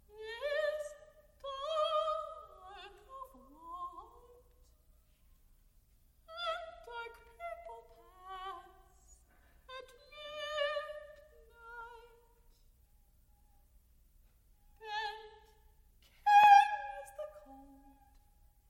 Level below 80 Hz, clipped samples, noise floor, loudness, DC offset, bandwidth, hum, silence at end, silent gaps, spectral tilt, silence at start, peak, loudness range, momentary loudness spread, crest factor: -66 dBFS; under 0.1%; -67 dBFS; -32 LUFS; under 0.1%; 16 kHz; none; 1.1 s; none; -1.5 dB/octave; 0.15 s; -12 dBFS; 22 LU; 24 LU; 26 dB